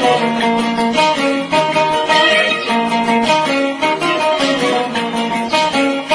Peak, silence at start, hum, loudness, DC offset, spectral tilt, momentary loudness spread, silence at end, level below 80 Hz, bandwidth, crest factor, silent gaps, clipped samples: 0 dBFS; 0 s; none; -14 LUFS; under 0.1%; -3.5 dB/octave; 5 LU; 0 s; -52 dBFS; 10.5 kHz; 14 dB; none; under 0.1%